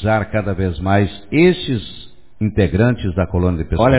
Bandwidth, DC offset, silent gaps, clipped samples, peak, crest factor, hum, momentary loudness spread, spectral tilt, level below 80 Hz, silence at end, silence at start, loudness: 4 kHz; 1%; none; under 0.1%; 0 dBFS; 16 dB; none; 9 LU; -11.5 dB/octave; -30 dBFS; 0 s; 0 s; -17 LUFS